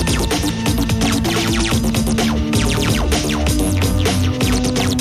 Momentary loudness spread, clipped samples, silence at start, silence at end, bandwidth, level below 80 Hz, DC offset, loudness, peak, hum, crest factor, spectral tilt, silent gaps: 1 LU; under 0.1%; 0 s; 0 s; 15.5 kHz; -24 dBFS; under 0.1%; -17 LUFS; -2 dBFS; none; 14 dB; -4.5 dB/octave; none